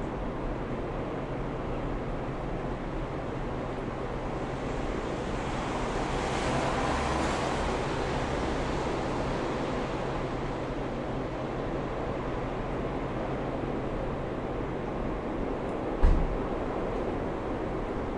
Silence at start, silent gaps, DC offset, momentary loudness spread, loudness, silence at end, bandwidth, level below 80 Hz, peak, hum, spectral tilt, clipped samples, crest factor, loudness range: 0 s; none; under 0.1%; 6 LU; -32 LUFS; 0 s; 11 kHz; -36 dBFS; -12 dBFS; none; -6.5 dB/octave; under 0.1%; 20 dB; 5 LU